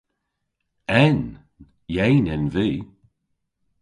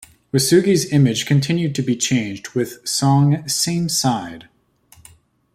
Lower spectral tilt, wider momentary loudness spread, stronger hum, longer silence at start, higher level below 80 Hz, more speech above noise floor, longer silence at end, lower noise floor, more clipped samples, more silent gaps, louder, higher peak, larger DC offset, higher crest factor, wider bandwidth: first, -8 dB/octave vs -5 dB/octave; first, 15 LU vs 9 LU; neither; first, 0.9 s vs 0.35 s; first, -44 dBFS vs -56 dBFS; first, 58 dB vs 35 dB; second, 0.95 s vs 1.1 s; first, -77 dBFS vs -52 dBFS; neither; neither; second, -21 LUFS vs -18 LUFS; about the same, -2 dBFS vs -2 dBFS; neither; about the same, 20 dB vs 16 dB; second, 10.5 kHz vs 15.5 kHz